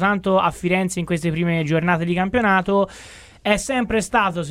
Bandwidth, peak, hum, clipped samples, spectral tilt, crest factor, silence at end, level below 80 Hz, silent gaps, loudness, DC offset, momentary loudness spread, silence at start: 14.5 kHz; -4 dBFS; none; under 0.1%; -5.5 dB/octave; 16 dB; 0 s; -44 dBFS; none; -20 LUFS; under 0.1%; 5 LU; 0 s